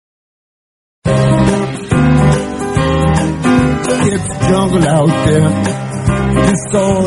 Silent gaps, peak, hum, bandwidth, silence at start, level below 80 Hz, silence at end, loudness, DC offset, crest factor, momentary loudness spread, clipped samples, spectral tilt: none; 0 dBFS; none; 11.5 kHz; 1.05 s; -28 dBFS; 0 s; -13 LUFS; under 0.1%; 12 dB; 5 LU; under 0.1%; -6.5 dB/octave